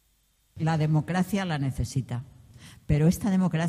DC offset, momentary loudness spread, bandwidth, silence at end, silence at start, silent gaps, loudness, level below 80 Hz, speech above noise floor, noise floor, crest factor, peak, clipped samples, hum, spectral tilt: under 0.1%; 8 LU; 15 kHz; 0 s; 0.55 s; none; -27 LUFS; -44 dBFS; 42 dB; -67 dBFS; 14 dB; -12 dBFS; under 0.1%; none; -7 dB/octave